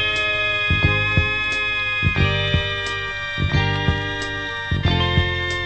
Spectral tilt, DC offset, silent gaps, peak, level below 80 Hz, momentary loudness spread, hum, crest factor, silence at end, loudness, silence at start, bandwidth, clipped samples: -5 dB/octave; under 0.1%; none; -4 dBFS; -32 dBFS; 7 LU; none; 18 dB; 0 s; -20 LUFS; 0 s; 9 kHz; under 0.1%